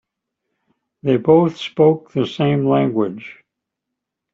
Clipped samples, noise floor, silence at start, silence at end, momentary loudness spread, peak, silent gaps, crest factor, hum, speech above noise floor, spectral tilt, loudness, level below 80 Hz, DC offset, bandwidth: under 0.1%; -81 dBFS; 1.05 s; 1 s; 11 LU; -2 dBFS; none; 16 dB; none; 64 dB; -8.5 dB/octave; -17 LUFS; -60 dBFS; under 0.1%; 7.4 kHz